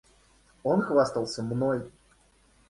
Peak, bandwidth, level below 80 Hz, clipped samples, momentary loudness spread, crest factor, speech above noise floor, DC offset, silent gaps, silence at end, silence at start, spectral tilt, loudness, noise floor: -10 dBFS; 11.5 kHz; -62 dBFS; under 0.1%; 10 LU; 20 dB; 36 dB; under 0.1%; none; 0.8 s; 0.65 s; -6.5 dB/octave; -28 LUFS; -62 dBFS